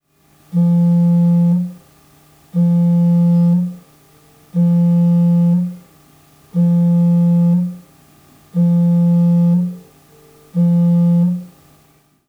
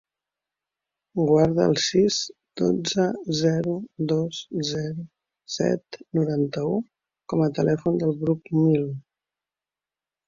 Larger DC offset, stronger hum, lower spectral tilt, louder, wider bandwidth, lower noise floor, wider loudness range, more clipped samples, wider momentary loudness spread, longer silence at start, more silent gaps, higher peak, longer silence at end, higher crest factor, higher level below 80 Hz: neither; neither; first, -11 dB/octave vs -6 dB/octave; first, -14 LUFS vs -24 LUFS; second, 1.3 kHz vs 7.6 kHz; second, -54 dBFS vs under -90 dBFS; about the same, 2 LU vs 4 LU; neither; about the same, 11 LU vs 12 LU; second, 0.55 s vs 1.15 s; neither; about the same, -8 dBFS vs -6 dBFS; second, 0.8 s vs 1.25 s; second, 8 dB vs 20 dB; about the same, -62 dBFS vs -60 dBFS